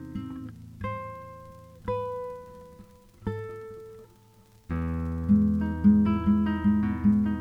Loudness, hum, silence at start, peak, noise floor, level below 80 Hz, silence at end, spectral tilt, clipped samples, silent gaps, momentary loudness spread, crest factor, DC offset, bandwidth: -27 LUFS; none; 0 s; -10 dBFS; -57 dBFS; -46 dBFS; 0 s; -9.5 dB/octave; under 0.1%; none; 21 LU; 18 dB; under 0.1%; 3.7 kHz